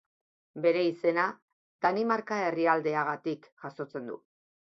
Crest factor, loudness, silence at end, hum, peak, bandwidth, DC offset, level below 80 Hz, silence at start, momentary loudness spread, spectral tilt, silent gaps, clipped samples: 20 dB; -29 LUFS; 0.55 s; none; -10 dBFS; 6.4 kHz; under 0.1%; -78 dBFS; 0.55 s; 15 LU; -6.5 dB/octave; 1.42-1.79 s, 3.52-3.57 s; under 0.1%